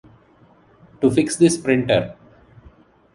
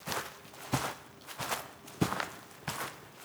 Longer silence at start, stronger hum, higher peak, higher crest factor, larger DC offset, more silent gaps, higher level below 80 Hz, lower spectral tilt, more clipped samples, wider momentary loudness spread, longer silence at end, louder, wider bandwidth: first, 1 s vs 0 s; neither; first, -2 dBFS vs -12 dBFS; second, 18 dB vs 26 dB; neither; neither; first, -52 dBFS vs -60 dBFS; about the same, -5 dB/octave vs -4 dB/octave; neither; second, 5 LU vs 13 LU; first, 1.05 s vs 0 s; first, -18 LUFS vs -37 LUFS; second, 11.5 kHz vs over 20 kHz